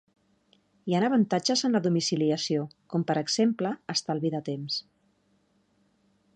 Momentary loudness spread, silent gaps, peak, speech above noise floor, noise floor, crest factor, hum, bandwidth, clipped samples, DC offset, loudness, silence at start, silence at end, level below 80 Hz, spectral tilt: 8 LU; none; -12 dBFS; 42 dB; -69 dBFS; 16 dB; none; 9.8 kHz; under 0.1%; under 0.1%; -27 LUFS; 0.85 s; 1.55 s; -76 dBFS; -5 dB/octave